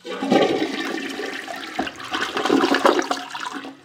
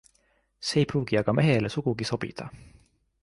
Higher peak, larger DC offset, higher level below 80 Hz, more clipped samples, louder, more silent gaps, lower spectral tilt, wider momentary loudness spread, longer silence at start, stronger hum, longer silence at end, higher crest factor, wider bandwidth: first, 0 dBFS vs -10 dBFS; neither; second, -62 dBFS vs -56 dBFS; neither; first, -22 LUFS vs -26 LUFS; neither; second, -3.5 dB/octave vs -6 dB/octave; about the same, 12 LU vs 13 LU; second, 0.05 s vs 0.6 s; neither; second, 0.1 s vs 0.55 s; about the same, 22 dB vs 18 dB; first, 17.5 kHz vs 11.5 kHz